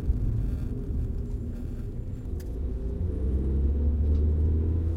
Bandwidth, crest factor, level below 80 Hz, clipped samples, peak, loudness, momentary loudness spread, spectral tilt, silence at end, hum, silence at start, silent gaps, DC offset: 2.5 kHz; 14 dB; -30 dBFS; under 0.1%; -14 dBFS; -30 LUFS; 10 LU; -10.5 dB/octave; 0 s; none; 0 s; none; under 0.1%